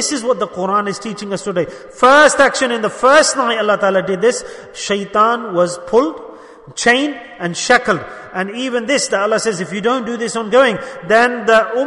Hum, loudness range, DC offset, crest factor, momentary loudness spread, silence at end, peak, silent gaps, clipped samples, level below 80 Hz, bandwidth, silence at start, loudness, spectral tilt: none; 4 LU; under 0.1%; 16 dB; 13 LU; 0 s; 0 dBFS; none; under 0.1%; -52 dBFS; 11 kHz; 0 s; -15 LUFS; -3 dB/octave